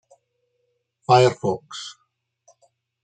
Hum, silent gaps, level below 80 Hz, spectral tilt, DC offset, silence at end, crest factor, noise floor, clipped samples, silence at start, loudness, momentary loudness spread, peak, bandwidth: none; none; -68 dBFS; -5.5 dB/octave; under 0.1%; 1.15 s; 22 dB; -73 dBFS; under 0.1%; 1.1 s; -19 LUFS; 20 LU; -2 dBFS; 9.2 kHz